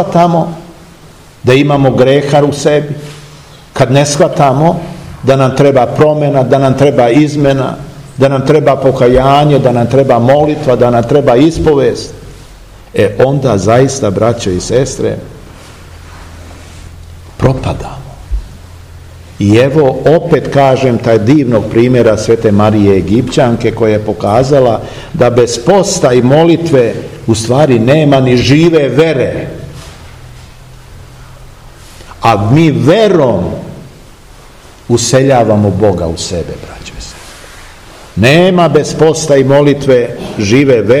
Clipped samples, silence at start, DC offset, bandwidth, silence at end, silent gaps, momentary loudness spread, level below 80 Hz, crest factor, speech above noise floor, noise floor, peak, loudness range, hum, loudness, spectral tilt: 3%; 0 s; under 0.1%; 15 kHz; 0 s; none; 14 LU; -32 dBFS; 10 dB; 28 dB; -36 dBFS; 0 dBFS; 7 LU; none; -9 LUFS; -6 dB/octave